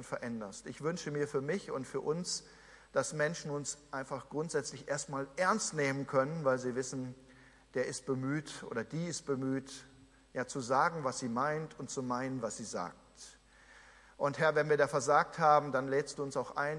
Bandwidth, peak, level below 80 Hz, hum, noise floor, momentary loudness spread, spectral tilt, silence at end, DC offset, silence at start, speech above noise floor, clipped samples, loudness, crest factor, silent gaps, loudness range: 11.5 kHz; -14 dBFS; -70 dBFS; none; -60 dBFS; 12 LU; -4.5 dB/octave; 0 s; under 0.1%; 0 s; 26 dB; under 0.1%; -35 LUFS; 22 dB; none; 7 LU